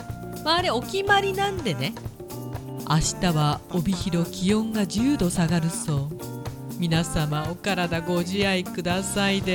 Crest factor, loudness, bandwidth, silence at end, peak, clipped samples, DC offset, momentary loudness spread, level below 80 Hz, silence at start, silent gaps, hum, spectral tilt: 18 dB; -25 LUFS; 18.5 kHz; 0 s; -6 dBFS; under 0.1%; under 0.1%; 12 LU; -42 dBFS; 0 s; none; none; -5 dB/octave